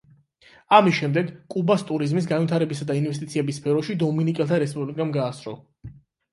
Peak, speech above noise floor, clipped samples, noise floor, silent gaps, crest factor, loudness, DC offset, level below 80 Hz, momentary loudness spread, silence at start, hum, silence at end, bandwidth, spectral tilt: -2 dBFS; 33 dB; under 0.1%; -55 dBFS; none; 22 dB; -23 LUFS; under 0.1%; -62 dBFS; 10 LU; 0.7 s; none; 0.4 s; 11.5 kHz; -7 dB/octave